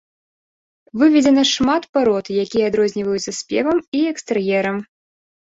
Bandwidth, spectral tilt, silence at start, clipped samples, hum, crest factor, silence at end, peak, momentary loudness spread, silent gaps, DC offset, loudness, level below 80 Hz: 8 kHz; -4 dB/octave; 0.95 s; under 0.1%; none; 16 dB; 0.65 s; -2 dBFS; 9 LU; 1.89-1.93 s, 3.88-3.92 s; under 0.1%; -18 LUFS; -54 dBFS